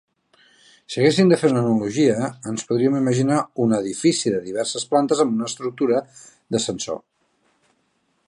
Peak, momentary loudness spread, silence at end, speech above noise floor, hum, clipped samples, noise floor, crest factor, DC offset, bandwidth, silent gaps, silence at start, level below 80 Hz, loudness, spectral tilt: -4 dBFS; 10 LU; 1.3 s; 48 dB; none; under 0.1%; -68 dBFS; 18 dB; under 0.1%; 11.5 kHz; none; 0.9 s; -64 dBFS; -21 LUFS; -5.5 dB/octave